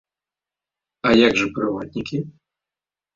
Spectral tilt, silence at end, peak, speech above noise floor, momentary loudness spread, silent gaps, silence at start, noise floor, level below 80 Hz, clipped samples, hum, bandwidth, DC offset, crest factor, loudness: -5 dB/octave; 0.85 s; -2 dBFS; over 70 dB; 14 LU; none; 1.05 s; under -90 dBFS; -54 dBFS; under 0.1%; none; 7.6 kHz; under 0.1%; 20 dB; -20 LUFS